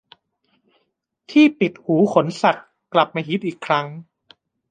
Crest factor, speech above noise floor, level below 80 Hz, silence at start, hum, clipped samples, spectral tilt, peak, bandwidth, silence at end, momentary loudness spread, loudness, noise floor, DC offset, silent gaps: 18 dB; 54 dB; -70 dBFS; 1.3 s; none; under 0.1%; -6.5 dB/octave; -2 dBFS; 9.2 kHz; 0.7 s; 10 LU; -19 LUFS; -72 dBFS; under 0.1%; none